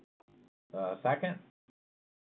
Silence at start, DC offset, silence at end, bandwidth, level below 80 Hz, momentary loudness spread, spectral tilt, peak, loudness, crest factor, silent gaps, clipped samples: 0.75 s; under 0.1%; 0.8 s; 4.2 kHz; -88 dBFS; 13 LU; -9.5 dB/octave; -18 dBFS; -35 LUFS; 20 dB; none; under 0.1%